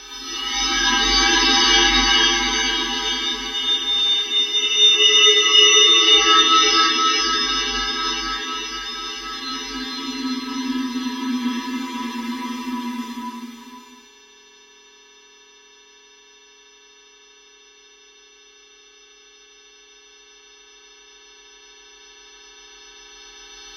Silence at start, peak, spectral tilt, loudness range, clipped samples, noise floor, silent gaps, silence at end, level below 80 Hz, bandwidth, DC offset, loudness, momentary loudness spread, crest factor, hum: 0 s; -2 dBFS; 0 dB/octave; 18 LU; under 0.1%; -50 dBFS; none; 0 s; -44 dBFS; 16.5 kHz; under 0.1%; -16 LUFS; 17 LU; 20 dB; none